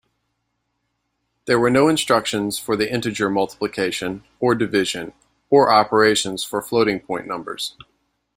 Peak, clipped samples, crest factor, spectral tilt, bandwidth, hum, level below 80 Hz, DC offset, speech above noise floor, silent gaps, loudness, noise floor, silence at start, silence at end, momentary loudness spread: -2 dBFS; under 0.1%; 20 dB; -4 dB/octave; 16 kHz; none; -56 dBFS; under 0.1%; 54 dB; none; -20 LUFS; -74 dBFS; 1.45 s; 0.65 s; 13 LU